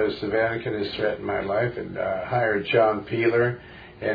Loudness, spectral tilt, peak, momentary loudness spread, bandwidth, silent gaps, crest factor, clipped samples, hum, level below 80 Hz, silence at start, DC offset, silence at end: -24 LUFS; -8.5 dB/octave; -6 dBFS; 8 LU; 5 kHz; none; 18 dB; under 0.1%; none; -54 dBFS; 0 s; under 0.1%; 0 s